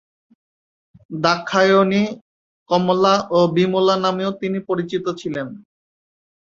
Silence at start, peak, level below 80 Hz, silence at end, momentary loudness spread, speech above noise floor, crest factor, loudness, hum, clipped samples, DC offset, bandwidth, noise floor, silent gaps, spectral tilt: 1.1 s; -2 dBFS; -62 dBFS; 1 s; 12 LU; over 72 dB; 18 dB; -18 LUFS; none; under 0.1%; under 0.1%; 7.6 kHz; under -90 dBFS; 2.21-2.66 s; -6 dB/octave